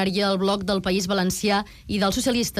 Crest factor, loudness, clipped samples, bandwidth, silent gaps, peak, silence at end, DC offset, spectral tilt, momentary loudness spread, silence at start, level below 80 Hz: 12 dB; -23 LUFS; under 0.1%; 15.5 kHz; none; -12 dBFS; 0 s; under 0.1%; -4 dB/octave; 3 LU; 0 s; -46 dBFS